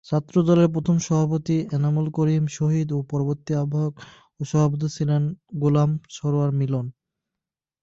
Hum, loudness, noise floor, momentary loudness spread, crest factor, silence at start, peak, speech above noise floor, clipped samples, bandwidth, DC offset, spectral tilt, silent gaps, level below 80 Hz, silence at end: none; -23 LUFS; -88 dBFS; 7 LU; 16 dB; 0.1 s; -6 dBFS; 66 dB; under 0.1%; 7.8 kHz; under 0.1%; -8 dB/octave; none; -58 dBFS; 0.9 s